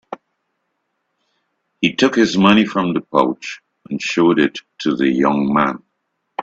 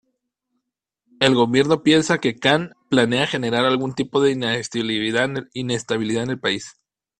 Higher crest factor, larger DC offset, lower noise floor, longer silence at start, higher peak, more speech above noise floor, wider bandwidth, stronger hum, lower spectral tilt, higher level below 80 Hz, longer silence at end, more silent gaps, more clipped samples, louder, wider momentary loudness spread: about the same, 18 dB vs 20 dB; neither; second, -72 dBFS vs -80 dBFS; second, 0.1 s vs 1.2 s; about the same, 0 dBFS vs 0 dBFS; second, 56 dB vs 60 dB; second, 8 kHz vs 10.5 kHz; neither; about the same, -5.5 dB/octave vs -4.5 dB/octave; about the same, -56 dBFS vs -58 dBFS; second, 0 s vs 0.5 s; neither; neither; first, -16 LUFS vs -20 LUFS; first, 18 LU vs 7 LU